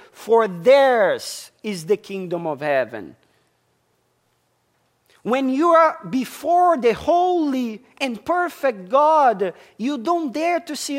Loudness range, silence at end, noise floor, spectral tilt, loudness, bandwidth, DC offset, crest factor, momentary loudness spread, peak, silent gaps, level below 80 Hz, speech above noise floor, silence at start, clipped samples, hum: 8 LU; 0 s; -66 dBFS; -4.5 dB/octave; -19 LUFS; 16 kHz; under 0.1%; 16 dB; 13 LU; -4 dBFS; none; -62 dBFS; 47 dB; 0.2 s; under 0.1%; none